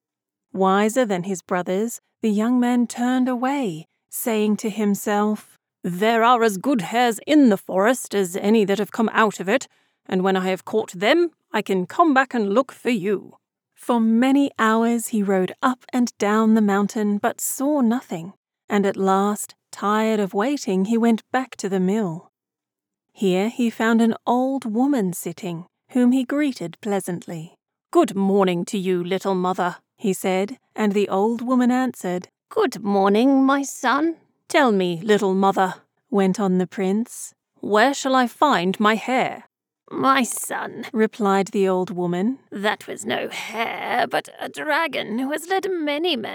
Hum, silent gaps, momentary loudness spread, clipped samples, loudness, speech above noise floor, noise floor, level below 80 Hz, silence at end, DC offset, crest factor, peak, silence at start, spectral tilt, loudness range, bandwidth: none; 18.37-18.43 s, 18.64-18.68 s; 10 LU; under 0.1%; -21 LUFS; 67 dB; -87 dBFS; -88 dBFS; 0 s; under 0.1%; 18 dB; -4 dBFS; 0.55 s; -5 dB/octave; 4 LU; 20 kHz